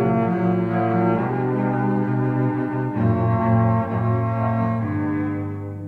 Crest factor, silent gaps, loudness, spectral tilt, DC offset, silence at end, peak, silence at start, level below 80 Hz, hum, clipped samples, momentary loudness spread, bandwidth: 12 dB; none; -21 LUFS; -11 dB/octave; under 0.1%; 0 s; -8 dBFS; 0 s; -50 dBFS; none; under 0.1%; 5 LU; 4.3 kHz